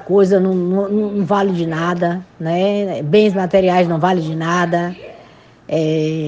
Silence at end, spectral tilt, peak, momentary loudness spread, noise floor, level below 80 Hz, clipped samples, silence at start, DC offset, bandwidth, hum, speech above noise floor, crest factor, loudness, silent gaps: 0 s; -7 dB/octave; 0 dBFS; 7 LU; -44 dBFS; -54 dBFS; under 0.1%; 0 s; under 0.1%; 8 kHz; none; 29 dB; 16 dB; -16 LUFS; none